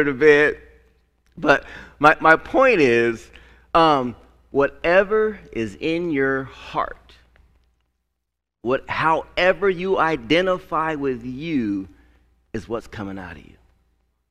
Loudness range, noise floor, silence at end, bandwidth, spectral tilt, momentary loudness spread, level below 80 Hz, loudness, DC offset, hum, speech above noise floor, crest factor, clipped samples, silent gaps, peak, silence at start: 9 LU; -80 dBFS; 0.9 s; 10.5 kHz; -6 dB/octave; 17 LU; -48 dBFS; -20 LUFS; under 0.1%; none; 60 dB; 22 dB; under 0.1%; none; 0 dBFS; 0 s